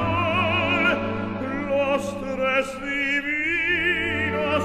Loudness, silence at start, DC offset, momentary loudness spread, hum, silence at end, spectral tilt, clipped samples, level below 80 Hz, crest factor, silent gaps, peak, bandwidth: -23 LUFS; 0 s; under 0.1%; 7 LU; none; 0 s; -5.5 dB/octave; under 0.1%; -46 dBFS; 16 dB; none; -8 dBFS; 15 kHz